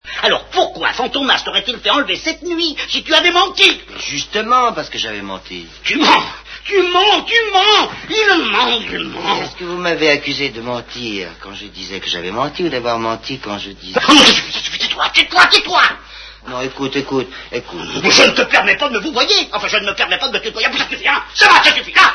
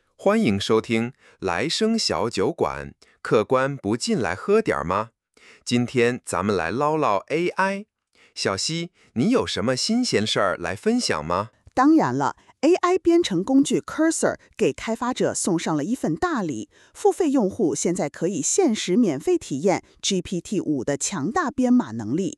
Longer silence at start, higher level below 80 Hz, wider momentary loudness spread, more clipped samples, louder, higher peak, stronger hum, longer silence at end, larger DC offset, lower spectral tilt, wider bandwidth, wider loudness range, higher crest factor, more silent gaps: second, 0.05 s vs 0.2 s; first, -44 dBFS vs -56 dBFS; first, 16 LU vs 7 LU; first, 0.2% vs under 0.1%; first, -13 LUFS vs -23 LUFS; first, 0 dBFS vs -6 dBFS; neither; about the same, 0 s vs 0.05 s; neither; second, -2 dB/octave vs -4.5 dB/octave; second, 11 kHz vs 12.5 kHz; first, 7 LU vs 3 LU; about the same, 16 dB vs 16 dB; neither